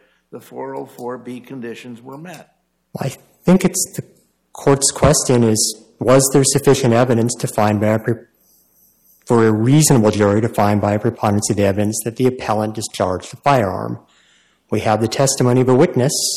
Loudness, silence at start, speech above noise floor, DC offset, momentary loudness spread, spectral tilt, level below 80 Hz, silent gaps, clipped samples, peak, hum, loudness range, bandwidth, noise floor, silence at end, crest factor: -16 LUFS; 0.35 s; 40 dB; under 0.1%; 18 LU; -5 dB/octave; -44 dBFS; none; under 0.1%; -2 dBFS; none; 8 LU; 16 kHz; -56 dBFS; 0 s; 16 dB